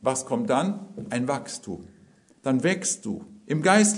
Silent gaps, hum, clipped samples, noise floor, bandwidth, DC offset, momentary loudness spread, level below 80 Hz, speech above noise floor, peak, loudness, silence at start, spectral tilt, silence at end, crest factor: none; none; under 0.1%; -57 dBFS; 11 kHz; under 0.1%; 13 LU; -68 dBFS; 32 dB; -4 dBFS; -26 LUFS; 0.05 s; -4 dB/octave; 0 s; 22 dB